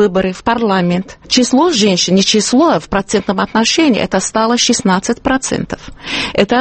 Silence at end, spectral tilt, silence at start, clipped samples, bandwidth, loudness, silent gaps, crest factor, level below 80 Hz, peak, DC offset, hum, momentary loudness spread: 0 s; -4 dB/octave; 0 s; under 0.1%; 8.8 kHz; -13 LUFS; none; 12 dB; -40 dBFS; 0 dBFS; under 0.1%; none; 8 LU